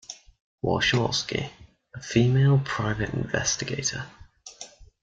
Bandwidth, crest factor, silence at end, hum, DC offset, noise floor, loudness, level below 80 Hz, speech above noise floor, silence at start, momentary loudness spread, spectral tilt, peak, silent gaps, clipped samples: 7.8 kHz; 20 dB; 0.2 s; none; under 0.1%; -47 dBFS; -25 LUFS; -50 dBFS; 22 dB; 0.1 s; 22 LU; -4.5 dB/octave; -6 dBFS; 0.41-0.58 s; under 0.1%